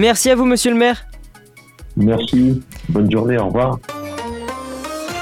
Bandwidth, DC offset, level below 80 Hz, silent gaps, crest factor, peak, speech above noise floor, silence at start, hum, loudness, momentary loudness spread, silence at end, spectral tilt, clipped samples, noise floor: 16.5 kHz; under 0.1%; -38 dBFS; none; 14 dB; -2 dBFS; 29 dB; 0 s; none; -17 LUFS; 14 LU; 0 s; -5 dB/octave; under 0.1%; -44 dBFS